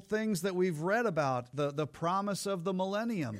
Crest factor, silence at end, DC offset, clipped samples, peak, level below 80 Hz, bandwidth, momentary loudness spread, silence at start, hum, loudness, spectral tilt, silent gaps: 14 dB; 0 s; under 0.1%; under 0.1%; -18 dBFS; -72 dBFS; 16 kHz; 4 LU; 0 s; none; -33 LUFS; -5.5 dB/octave; none